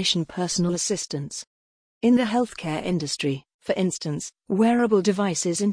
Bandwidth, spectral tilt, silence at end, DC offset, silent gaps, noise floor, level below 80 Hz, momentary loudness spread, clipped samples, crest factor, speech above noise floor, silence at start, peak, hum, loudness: 10.5 kHz; -4.5 dB/octave; 0 s; under 0.1%; 1.47-2.01 s, 3.54-3.59 s; under -90 dBFS; -60 dBFS; 11 LU; under 0.1%; 16 dB; over 67 dB; 0 s; -8 dBFS; none; -24 LUFS